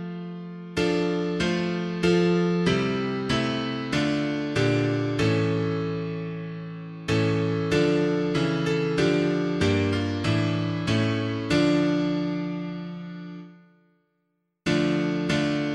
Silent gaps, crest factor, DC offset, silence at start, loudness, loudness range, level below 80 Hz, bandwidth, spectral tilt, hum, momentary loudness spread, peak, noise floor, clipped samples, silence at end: none; 16 dB; under 0.1%; 0 s; -25 LUFS; 4 LU; -52 dBFS; 11 kHz; -6.5 dB/octave; none; 12 LU; -8 dBFS; -75 dBFS; under 0.1%; 0 s